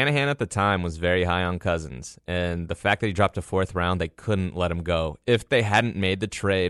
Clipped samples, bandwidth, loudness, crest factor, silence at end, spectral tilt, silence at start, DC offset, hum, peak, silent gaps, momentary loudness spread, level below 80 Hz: under 0.1%; 12 kHz; -24 LUFS; 18 dB; 0 s; -5.5 dB/octave; 0 s; under 0.1%; none; -8 dBFS; none; 6 LU; -44 dBFS